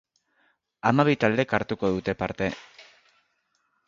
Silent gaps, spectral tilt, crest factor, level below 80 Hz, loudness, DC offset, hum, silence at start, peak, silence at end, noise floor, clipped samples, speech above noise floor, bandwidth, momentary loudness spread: none; -7 dB/octave; 24 dB; -56 dBFS; -25 LUFS; under 0.1%; none; 0.85 s; -2 dBFS; 1.05 s; -72 dBFS; under 0.1%; 48 dB; 7.4 kHz; 9 LU